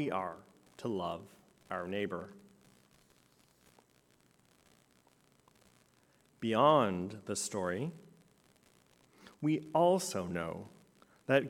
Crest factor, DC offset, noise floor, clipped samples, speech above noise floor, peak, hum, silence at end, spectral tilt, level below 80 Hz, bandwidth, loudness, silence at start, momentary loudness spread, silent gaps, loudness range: 24 dB; under 0.1%; -69 dBFS; under 0.1%; 35 dB; -12 dBFS; none; 0 s; -5 dB/octave; -78 dBFS; 16.5 kHz; -34 LUFS; 0 s; 18 LU; none; 11 LU